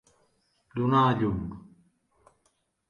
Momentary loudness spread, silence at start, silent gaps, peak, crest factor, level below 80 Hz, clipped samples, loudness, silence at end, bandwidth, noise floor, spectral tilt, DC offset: 17 LU; 0.75 s; none; -10 dBFS; 20 dB; -52 dBFS; under 0.1%; -26 LUFS; 1.3 s; 9 kHz; -73 dBFS; -8.5 dB/octave; under 0.1%